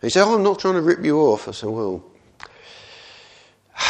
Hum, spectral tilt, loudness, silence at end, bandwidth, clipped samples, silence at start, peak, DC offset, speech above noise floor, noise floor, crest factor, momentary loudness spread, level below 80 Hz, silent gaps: none; -4.5 dB/octave; -19 LUFS; 0 s; 10 kHz; under 0.1%; 0.05 s; 0 dBFS; under 0.1%; 33 dB; -51 dBFS; 20 dB; 24 LU; -60 dBFS; none